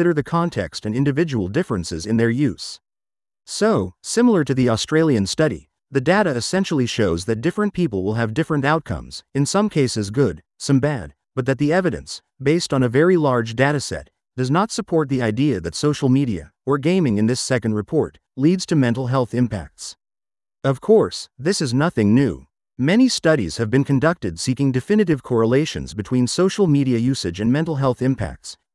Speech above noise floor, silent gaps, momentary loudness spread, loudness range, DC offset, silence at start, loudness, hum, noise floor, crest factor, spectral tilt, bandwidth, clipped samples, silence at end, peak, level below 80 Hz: over 71 dB; none; 9 LU; 2 LU; under 0.1%; 0 s; -20 LUFS; none; under -90 dBFS; 16 dB; -6 dB/octave; 12 kHz; under 0.1%; 0.2 s; -2 dBFS; -48 dBFS